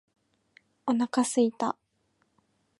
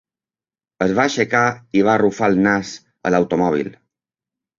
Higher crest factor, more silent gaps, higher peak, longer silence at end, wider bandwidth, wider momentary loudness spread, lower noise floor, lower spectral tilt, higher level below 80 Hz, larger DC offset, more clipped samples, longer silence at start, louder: about the same, 18 dB vs 18 dB; neither; second, -12 dBFS vs -2 dBFS; first, 1.1 s vs 0.85 s; first, 11.5 kHz vs 7.6 kHz; first, 11 LU vs 8 LU; second, -73 dBFS vs under -90 dBFS; second, -4 dB/octave vs -5.5 dB/octave; second, -80 dBFS vs -54 dBFS; neither; neither; about the same, 0.85 s vs 0.8 s; second, -28 LUFS vs -18 LUFS